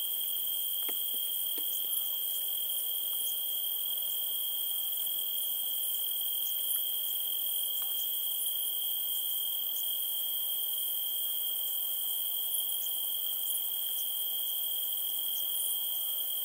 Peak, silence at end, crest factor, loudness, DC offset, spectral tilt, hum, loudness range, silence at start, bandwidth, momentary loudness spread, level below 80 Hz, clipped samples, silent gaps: -18 dBFS; 0 s; 16 dB; -30 LUFS; under 0.1%; 3 dB/octave; none; 0 LU; 0 s; 16 kHz; 1 LU; -86 dBFS; under 0.1%; none